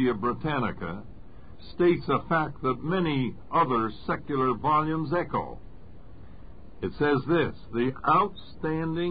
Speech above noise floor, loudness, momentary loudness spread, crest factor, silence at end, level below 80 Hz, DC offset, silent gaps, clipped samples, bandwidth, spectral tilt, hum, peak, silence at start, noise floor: 21 dB; -27 LUFS; 12 LU; 16 dB; 0 s; -50 dBFS; 0.8%; none; under 0.1%; 5 kHz; -11 dB/octave; none; -12 dBFS; 0 s; -48 dBFS